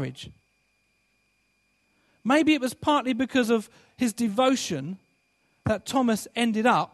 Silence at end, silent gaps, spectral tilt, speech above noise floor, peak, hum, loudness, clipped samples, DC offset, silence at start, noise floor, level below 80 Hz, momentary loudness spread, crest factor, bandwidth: 0.05 s; none; -4.5 dB/octave; 45 dB; -8 dBFS; none; -25 LUFS; under 0.1%; under 0.1%; 0 s; -70 dBFS; -62 dBFS; 15 LU; 18 dB; 13 kHz